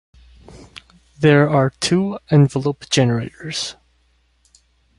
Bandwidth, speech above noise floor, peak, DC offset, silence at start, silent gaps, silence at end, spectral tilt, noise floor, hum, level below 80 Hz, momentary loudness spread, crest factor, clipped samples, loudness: 11.5 kHz; 44 dB; -2 dBFS; under 0.1%; 0.5 s; none; 1.25 s; -5.5 dB/octave; -60 dBFS; none; -52 dBFS; 11 LU; 18 dB; under 0.1%; -18 LUFS